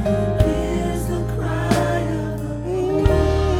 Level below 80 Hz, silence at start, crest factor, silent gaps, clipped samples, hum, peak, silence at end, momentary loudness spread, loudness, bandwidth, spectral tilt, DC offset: -26 dBFS; 0 s; 18 dB; none; under 0.1%; none; -2 dBFS; 0 s; 7 LU; -21 LUFS; 16.5 kHz; -7 dB/octave; under 0.1%